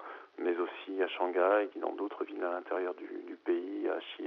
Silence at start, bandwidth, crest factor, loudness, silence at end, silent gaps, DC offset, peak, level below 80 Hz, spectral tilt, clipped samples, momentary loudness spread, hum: 0 s; 5.2 kHz; 18 dB; -34 LUFS; 0 s; none; under 0.1%; -16 dBFS; under -90 dBFS; 0.5 dB/octave; under 0.1%; 10 LU; none